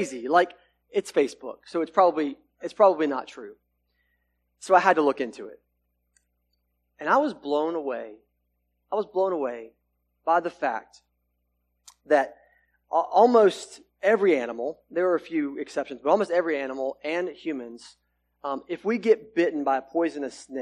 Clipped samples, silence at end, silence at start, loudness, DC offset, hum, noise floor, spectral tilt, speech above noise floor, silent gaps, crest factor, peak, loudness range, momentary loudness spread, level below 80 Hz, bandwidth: under 0.1%; 0 s; 0 s; -25 LUFS; under 0.1%; 60 Hz at -65 dBFS; -75 dBFS; -5 dB/octave; 50 dB; none; 22 dB; -4 dBFS; 6 LU; 15 LU; -72 dBFS; 12 kHz